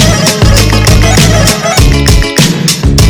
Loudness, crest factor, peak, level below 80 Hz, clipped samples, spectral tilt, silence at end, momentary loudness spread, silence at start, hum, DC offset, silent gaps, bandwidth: -6 LUFS; 6 dB; 0 dBFS; -12 dBFS; 10%; -4 dB/octave; 0 s; 2 LU; 0 s; none; under 0.1%; none; over 20 kHz